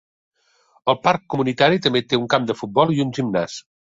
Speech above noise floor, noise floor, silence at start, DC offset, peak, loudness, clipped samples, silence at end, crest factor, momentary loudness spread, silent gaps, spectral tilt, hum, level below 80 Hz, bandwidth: 41 dB; -60 dBFS; 0.85 s; under 0.1%; -2 dBFS; -20 LUFS; under 0.1%; 0.35 s; 20 dB; 8 LU; none; -5.5 dB/octave; none; -58 dBFS; 7.8 kHz